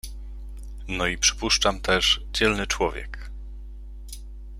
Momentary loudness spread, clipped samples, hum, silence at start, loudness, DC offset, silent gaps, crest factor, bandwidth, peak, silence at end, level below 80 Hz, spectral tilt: 21 LU; under 0.1%; none; 0.05 s; -22 LUFS; under 0.1%; none; 20 dB; 16 kHz; -6 dBFS; 0 s; -36 dBFS; -2 dB/octave